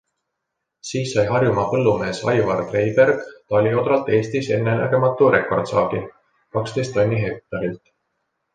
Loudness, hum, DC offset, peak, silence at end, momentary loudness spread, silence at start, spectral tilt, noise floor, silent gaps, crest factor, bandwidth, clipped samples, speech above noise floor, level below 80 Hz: -20 LUFS; none; under 0.1%; -2 dBFS; 0.8 s; 11 LU; 0.85 s; -6.5 dB/octave; -79 dBFS; none; 18 dB; 9.4 kHz; under 0.1%; 60 dB; -52 dBFS